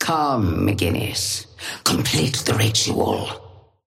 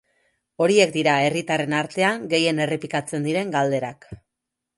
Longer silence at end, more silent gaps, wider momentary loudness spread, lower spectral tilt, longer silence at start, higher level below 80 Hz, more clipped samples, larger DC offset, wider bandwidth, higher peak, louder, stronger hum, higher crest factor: second, 0.25 s vs 0.6 s; neither; about the same, 8 LU vs 8 LU; about the same, -4 dB/octave vs -4.5 dB/octave; second, 0 s vs 0.6 s; first, -44 dBFS vs -62 dBFS; neither; neither; first, 16.5 kHz vs 11.5 kHz; about the same, -4 dBFS vs -2 dBFS; about the same, -20 LUFS vs -21 LUFS; neither; about the same, 18 dB vs 20 dB